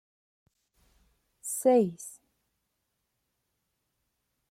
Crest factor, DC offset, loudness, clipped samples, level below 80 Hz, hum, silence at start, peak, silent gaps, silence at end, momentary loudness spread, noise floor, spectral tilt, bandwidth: 22 dB; under 0.1%; -27 LUFS; under 0.1%; -76 dBFS; none; 1.45 s; -12 dBFS; none; 2.4 s; 20 LU; -81 dBFS; -5.5 dB/octave; 16.5 kHz